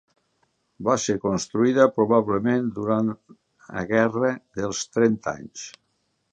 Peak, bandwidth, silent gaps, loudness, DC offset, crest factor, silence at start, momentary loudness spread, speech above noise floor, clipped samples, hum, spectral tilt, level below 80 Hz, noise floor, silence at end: -2 dBFS; 9.4 kHz; none; -23 LUFS; under 0.1%; 20 dB; 0.8 s; 16 LU; 49 dB; under 0.1%; none; -5.5 dB/octave; -58 dBFS; -72 dBFS; 0.65 s